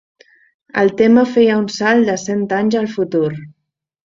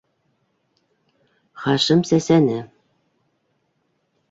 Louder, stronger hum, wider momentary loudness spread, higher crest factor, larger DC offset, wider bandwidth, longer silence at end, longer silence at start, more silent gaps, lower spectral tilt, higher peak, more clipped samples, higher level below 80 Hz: first, -15 LUFS vs -18 LUFS; neither; second, 8 LU vs 13 LU; about the same, 14 dB vs 18 dB; neither; about the same, 7.6 kHz vs 7.8 kHz; second, 0.55 s vs 1.65 s; second, 0.75 s vs 1.55 s; neither; about the same, -5.5 dB/octave vs -5.5 dB/octave; about the same, -2 dBFS vs -4 dBFS; neither; about the same, -58 dBFS vs -60 dBFS